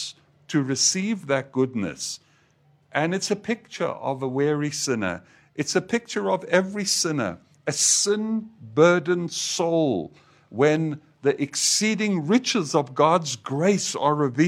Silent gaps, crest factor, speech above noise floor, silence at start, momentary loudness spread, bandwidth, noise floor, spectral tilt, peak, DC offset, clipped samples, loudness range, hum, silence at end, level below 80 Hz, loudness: none; 20 dB; 38 dB; 0 s; 10 LU; 16 kHz; -61 dBFS; -3.5 dB/octave; -4 dBFS; under 0.1%; under 0.1%; 5 LU; none; 0 s; -68 dBFS; -23 LUFS